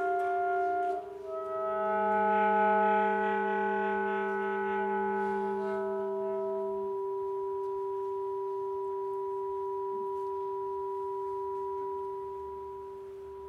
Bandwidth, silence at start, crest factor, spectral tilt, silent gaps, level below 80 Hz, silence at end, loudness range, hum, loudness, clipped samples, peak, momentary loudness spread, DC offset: 4.8 kHz; 0 s; 14 dB; -7.5 dB/octave; none; -68 dBFS; 0 s; 7 LU; none; -32 LUFS; under 0.1%; -18 dBFS; 11 LU; under 0.1%